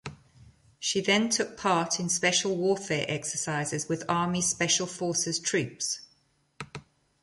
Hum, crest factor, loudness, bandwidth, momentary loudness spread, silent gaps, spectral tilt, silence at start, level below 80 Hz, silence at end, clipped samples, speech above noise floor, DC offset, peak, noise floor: none; 20 dB; -27 LUFS; 11.5 kHz; 12 LU; none; -3 dB/octave; 0.05 s; -64 dBFS; 0.4 s; under 0.1%; 40 dB; under 0.1%; -10 dBFS; -68 dBFS